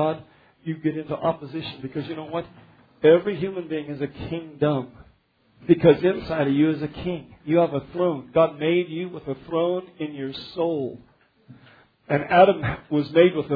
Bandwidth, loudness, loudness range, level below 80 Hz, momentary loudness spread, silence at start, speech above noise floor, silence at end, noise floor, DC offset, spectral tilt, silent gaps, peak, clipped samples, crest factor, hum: 5 kHz; -23 LUFS; 5 LU; -54 dBFS; 15 LU; 0 s; 39 dB; 0 s; -61 dBFS; under 0.1%; -10 dB/octave; none; -4 dBFS; under 0.1%; 20 dB; none